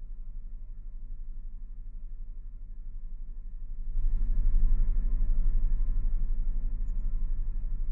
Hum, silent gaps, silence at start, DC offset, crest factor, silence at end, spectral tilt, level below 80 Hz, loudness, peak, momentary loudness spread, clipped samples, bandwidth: none; none; 0 s; under 0.1%; 14 dB; 0 s; -11 dB/octave; -28 dBFS; -36 LUFS; -14 dBFS; 15 LU; under 0.1%; 1.1 kHz